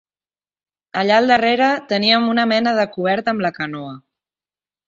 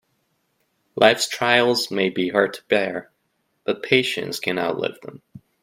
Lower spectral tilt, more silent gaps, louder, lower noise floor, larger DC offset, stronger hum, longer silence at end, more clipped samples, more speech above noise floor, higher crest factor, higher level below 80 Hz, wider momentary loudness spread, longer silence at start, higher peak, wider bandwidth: first, -5 dB/octave vs -3.5 dB/octave; neither; first, -17 LUFS vs -21 LUFS; first, under -90 dBFS vs -71 dBFS; neither; first, 50 Hz at -45 dBFS vs none; first, 0.9 s vs 0.25 s; neither; first, over 73 dB vs 50 dB; about the same, 18 dB vs 22 dB; about the same, -62 dBFS vs -66 dBFS; about the same, 13 LU vs 15 LU; about the same, 0.95 s vs 0.95 s; about the same, 0 dBFS vs 0 dBFS; second, 7.6 kHz vs 16 kHz